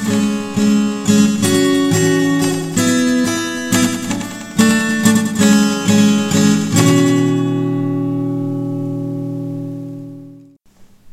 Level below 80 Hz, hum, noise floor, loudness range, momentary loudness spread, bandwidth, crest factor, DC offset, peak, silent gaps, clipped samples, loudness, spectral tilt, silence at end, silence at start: -50 dBFS; none; -45 dBFS; 7 LU; 11 LU; 16 kHz; 14 dB; under 0.1%; 0 dBFS; none; under 0.1%; -15 LUFS; -5 dB/octave; 0.05 s; 0 s